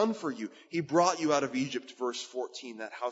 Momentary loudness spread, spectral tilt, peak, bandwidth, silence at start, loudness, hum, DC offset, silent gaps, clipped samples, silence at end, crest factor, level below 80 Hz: 13 LU; -4 dB/octave; -12 dBFS; 8 kHz; 0 s; -32 LUFS; none; under 0.1%; none; under 0.1%; 0 s; 20 dB; -82 dBFS